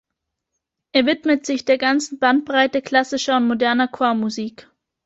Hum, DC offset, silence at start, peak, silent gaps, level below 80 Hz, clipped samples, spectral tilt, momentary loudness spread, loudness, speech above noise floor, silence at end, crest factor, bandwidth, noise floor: none; under 0.1%; 0.95 s; -2 dBFS; none; -64 dBFS; under 0.1%; -3.5 dB/octave; 4 LU; -19 LUFS; 61 dB; 0.55 s; 18 dB; 8 kHz; -80 dBFS